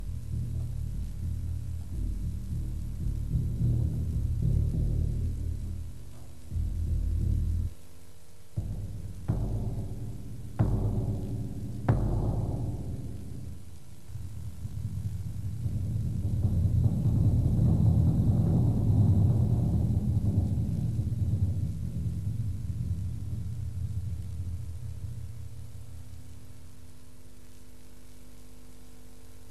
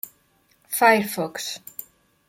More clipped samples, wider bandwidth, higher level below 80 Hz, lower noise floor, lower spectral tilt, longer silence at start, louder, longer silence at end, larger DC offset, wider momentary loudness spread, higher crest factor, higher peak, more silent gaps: neither; second, 13 kHz vs 17 kHz; first, -36 dBFS vs -70 dBFS; second, -54 dBFS vs -63 dBFS; first, -9 dB/octave vs -3 dB/octave; about the same, 0 s vs 0.05 s; second, -31 LUFS vs -21 LUFS; second, 0 s vs 0.45 s; first, 1% vs under 0.1%; second, 17 LU vs 21 LU; about the same, 20 dB vs 22 dB; second, -10 dBFS vs -4 dBFS; neither